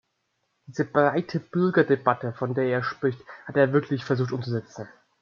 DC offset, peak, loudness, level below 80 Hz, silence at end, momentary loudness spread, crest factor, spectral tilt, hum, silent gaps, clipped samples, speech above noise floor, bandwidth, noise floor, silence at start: under 0.1%; -4 dBFS; -25 LUFS; -70 dBFS; 0.35 s; 14 LU; 22 dB; -8 dB/octave; none; none; under 0.1%; 51 dB; 7.2 kHz; -75 dBFS; 0.7 s